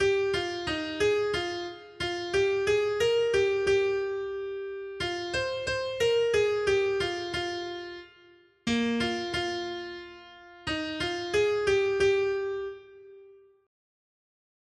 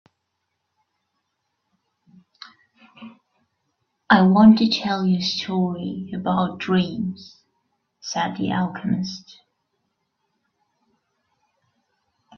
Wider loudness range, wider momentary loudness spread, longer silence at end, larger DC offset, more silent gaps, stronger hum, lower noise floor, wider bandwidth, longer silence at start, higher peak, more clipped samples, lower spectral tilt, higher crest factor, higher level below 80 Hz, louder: second, 4 LU vs 11 LU; second, 13 LU vs 16 LU; second, 1.35 s vs 3.2 s; neither; neither; neither; second, -58 dBFS vs -77 dBFS; first, 11.5 kHz vs 6.8 kHz; second, 0 s vs 3 s; second, -14 dBFS vs 0 dBFS; neither; second, -4 dB/octave vs -6 dB/octave; second, 14 dB vs 24 dB; about the same, -56 dBFS vs -60 dBFS; second, -28 LUFS vs -20 LUFS